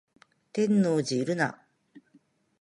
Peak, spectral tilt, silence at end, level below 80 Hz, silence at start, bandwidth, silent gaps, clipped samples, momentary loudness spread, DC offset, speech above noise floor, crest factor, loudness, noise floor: -12 dBFS; -6 dB/octave; 0.6 s; -76 dBFS; 0.55 s; 11 kHz; none; under 0.1%; 7 LU; under 0.1%; 39 dB; 16 dB; -27 LUFS; -64 dBFS